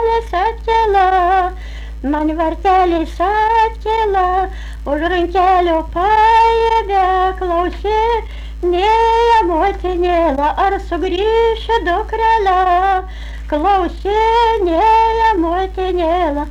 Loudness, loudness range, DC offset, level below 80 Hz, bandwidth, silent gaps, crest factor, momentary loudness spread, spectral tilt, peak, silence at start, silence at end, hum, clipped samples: -14 LUFS; 2 LU; under 0.1%; -28 dBFS; 11 kHz; none; 8 dB; 7 LU; -6 dB/octave; -6 dBFS; 0 s; 0 s; none; under 0.1%